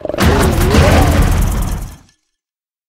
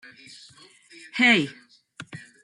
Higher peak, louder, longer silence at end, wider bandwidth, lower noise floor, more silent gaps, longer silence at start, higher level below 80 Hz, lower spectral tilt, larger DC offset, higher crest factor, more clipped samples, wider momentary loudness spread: first, 0 dBFS vs -6 dBFS; first, -12 LUFS vs -21 LUFS; first, 0.95 s vs 0.25 s; first, 16.5 kHz vs 11.5 kHz; first, -90 dBFS vs -52 dBFS; neither; second, 0.05 s vs 1.15 s; first, -18 dBFS vs -74 dBFS; first, -5.5 dB/octave vs -4 dB/octave; neither; second, 12 dB vs 22 dB; neither; second, 14 LU vs 27 LU